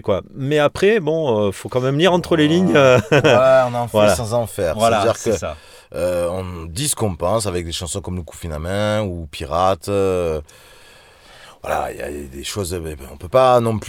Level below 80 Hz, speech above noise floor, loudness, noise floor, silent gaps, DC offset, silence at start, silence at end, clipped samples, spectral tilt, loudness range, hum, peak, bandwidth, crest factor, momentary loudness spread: -40 dBFS; 28 dB; -18 LUFS; -46 dBFS; none; under 0.1%; 0.05 s; 0 s; under 0.1%; -5 dB/octave; 8 LU; none; -2 dBFS; 18.5 kHz; 16 dB; 15 LU